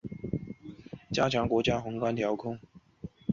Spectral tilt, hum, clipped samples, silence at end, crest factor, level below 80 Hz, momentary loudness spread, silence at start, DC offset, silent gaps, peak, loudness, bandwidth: -6 dB/octave; none; under 0.1%; 0 s; 20 dB; -54 dBFS; 19 LU; 0.05 s; under 0.1%; none; -12 dBFS; -31 LUFS; 7.6 kHz